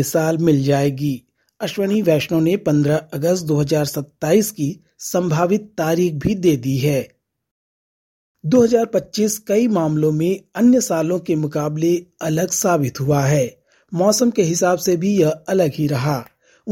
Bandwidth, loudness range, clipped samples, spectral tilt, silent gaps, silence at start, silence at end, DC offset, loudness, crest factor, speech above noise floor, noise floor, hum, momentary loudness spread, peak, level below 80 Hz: 17 kHz; 2 LU; under 0.1%; -6 dB/octave; 7.51-8.35 s; 0 s; 0 s; under 0.1%; -18 LUFS; 16 dB; over 73 dB; under -90 dBFS; none; 8 LU; -2 dBFS; -52 dBFS